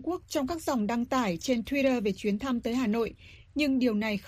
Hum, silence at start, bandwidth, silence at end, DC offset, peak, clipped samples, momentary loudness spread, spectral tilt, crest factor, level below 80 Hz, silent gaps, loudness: none; 0 s; 15.5 kHz; 0 s; under 0.1%; -14 dBFS; under 0.1%; 5 LU; -5 dB/octave; 14 dB; -54 dBFS; none; -29 LUFS